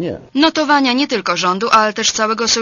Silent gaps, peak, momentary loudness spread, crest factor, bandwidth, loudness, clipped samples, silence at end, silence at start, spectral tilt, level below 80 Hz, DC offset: none; 0 dBFS; 4 LU; 16 dB; 11 kHz; -14 LUFS; under 0.1%; 0 s; 0 s; -2.5 dB/octave; -52 dBFS; under 0.1%